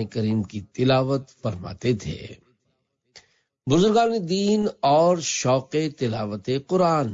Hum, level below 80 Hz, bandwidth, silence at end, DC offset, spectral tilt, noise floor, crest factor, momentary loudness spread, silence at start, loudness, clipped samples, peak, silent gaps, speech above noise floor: none; -56 dBFS; 7.8 kHz; 0 s; under 0.1%; -5.5 dB/octave; -73 dBFS; 14 dB; 12 LU; 0 s; -23 LUFS; under 0.1%; -10 dBFS; none; 51 dB